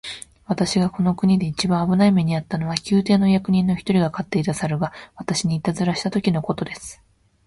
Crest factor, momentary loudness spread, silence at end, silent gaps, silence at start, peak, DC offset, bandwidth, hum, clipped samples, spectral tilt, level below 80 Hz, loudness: 18 dB; 11 LU; 0.55 s; none; 0.05 s; -2 dBFS; under 0.1%; 11.5 kHz; none; under 0.1%; -6 dB/octave; -50 dBFS; -21 LUFS